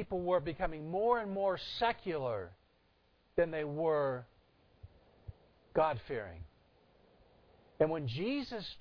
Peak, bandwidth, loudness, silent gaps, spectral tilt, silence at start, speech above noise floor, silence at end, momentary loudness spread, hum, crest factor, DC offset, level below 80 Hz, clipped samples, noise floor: -16 dBFS; 5.4 kHz; -35 LUFS; none; -4.5 dB/octave; 0 s; 36 dB; 0 s; 19 LU; none; 20 dB; under 0.1%; -58 dBFS; under 0.1%; -71 dBFS